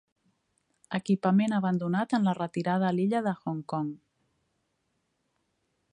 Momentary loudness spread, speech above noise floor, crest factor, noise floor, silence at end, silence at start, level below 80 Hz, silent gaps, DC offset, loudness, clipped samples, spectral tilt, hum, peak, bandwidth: 10 LU; 50 dB; 18 dB; -77 dBFS; 1.95 s; 0.9 s; -74 dBFS; none; under 0.1%; -28 LUFS; under 0.1%; -7.5 dB/octave; none; -12 dBFS; 9.8 kHz